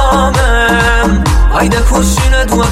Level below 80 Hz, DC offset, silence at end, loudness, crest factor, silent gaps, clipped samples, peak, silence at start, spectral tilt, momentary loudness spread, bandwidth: -12 dBFS; under 0.1%; 0 s; -10 LUFS; 8 dB; none; under 0.1%; 0 dBFS; 0 s; -4.5 dB/octave; 2 LU; 15.5 kHz